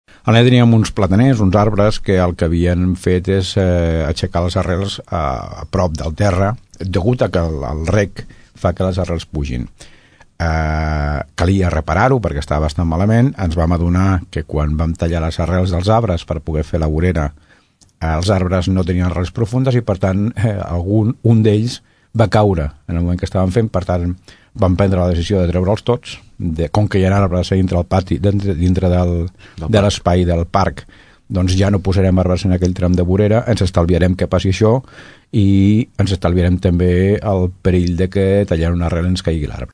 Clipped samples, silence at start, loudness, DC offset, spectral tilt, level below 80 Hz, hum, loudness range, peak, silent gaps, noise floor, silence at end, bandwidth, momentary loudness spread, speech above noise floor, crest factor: under 0.1%; 0.25 s; -16 LUFS; under 0.1%; -7.5 dB/octave; -28 dBFS; none; 4 LU; 0 dBFS; none; -51 dBFS; 0.05 s; 10.5 kHz; 8 LU; 37 dB; 14 dB